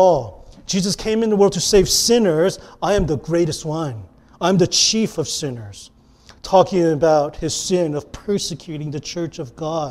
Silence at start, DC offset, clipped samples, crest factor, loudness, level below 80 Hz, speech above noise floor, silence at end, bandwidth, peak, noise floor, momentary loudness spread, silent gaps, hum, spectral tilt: 0 s; under 0.1%; under 0.1%; 18 dB; -18 LUFS; -40 dBFS; 30 dB; 0 s; 16 kHz; 0 dBFS; -48 dBFS; 14 LU; none; none; -4 dB/octave